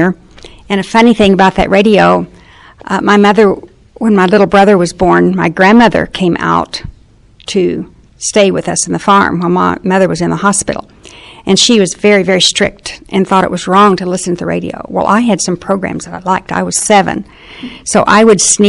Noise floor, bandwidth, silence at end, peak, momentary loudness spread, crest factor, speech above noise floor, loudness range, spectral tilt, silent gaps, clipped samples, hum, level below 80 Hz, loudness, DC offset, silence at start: -42 dBFS; 11.5 kHz; 0 s; 0 dBFS; 13 LU; 10 dB; 32 dB; 4 LU; -4 dB/octave; none; 0.3%; none; -38 dBFS; -10 LUFS; under 0.1%; 0 s